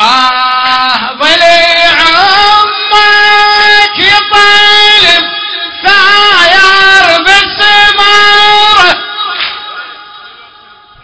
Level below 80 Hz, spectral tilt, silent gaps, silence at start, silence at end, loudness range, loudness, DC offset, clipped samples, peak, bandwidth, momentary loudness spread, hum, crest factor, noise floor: -38 dBFS; -0.5 dB/octave; none; 0 s; 0 s; 2 LU; -4 LUFS; 3%; 8%; 0 dBFS; 8 kHz; 10 LU; none; 6 dB; -36 dBFS